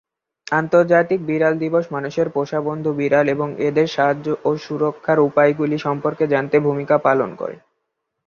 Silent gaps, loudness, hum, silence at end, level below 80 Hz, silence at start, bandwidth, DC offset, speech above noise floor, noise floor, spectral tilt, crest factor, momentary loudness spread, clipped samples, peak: none; -19 LUFS; none; 0.7 s; -62 dBFS; 0.5 s; 7.2 kHz; under 0.1%; 58 dB; -76 dBFS; -7.5 dB/octave; 16 dB; 6 LU; under 0.1%; -2 dBFS